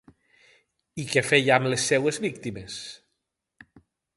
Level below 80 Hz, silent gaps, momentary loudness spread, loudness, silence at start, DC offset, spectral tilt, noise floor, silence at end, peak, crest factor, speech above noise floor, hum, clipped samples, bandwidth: -64 dBFS; none; 17 LU; -23 LUFS; 0.95 s; under 0.1%; -3.5 dB/octave; -81 dBFS; 1.2 s; -4 dBFS; 24 dB; 56 dB; none; under 0.1%; 11.5 kHz